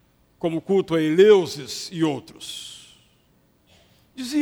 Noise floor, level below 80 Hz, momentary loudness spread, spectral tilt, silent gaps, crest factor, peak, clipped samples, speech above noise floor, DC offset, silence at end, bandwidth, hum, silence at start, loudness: -61 dBFS; -64 dBFS; 20 LU; -5.5 dB/octave; none; 18 dB; -4 dBFS; under 0.1%; 41 dB; under 0.1%; 0 s; 16.5 kHz; none; 0.45 s; -21 LUFS